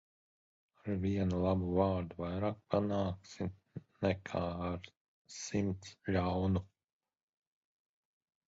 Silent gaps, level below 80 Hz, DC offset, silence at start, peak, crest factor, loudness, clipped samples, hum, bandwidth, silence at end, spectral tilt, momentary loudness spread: 4.97-5.25 s; -52 dBFS; under 0.1%; 0.85 s; -16 dBFS; 22 dB; -36 LUFS; under 0.1%; none; 7.6 kHz; 1.85 s; -7 dB/octave; 13 LU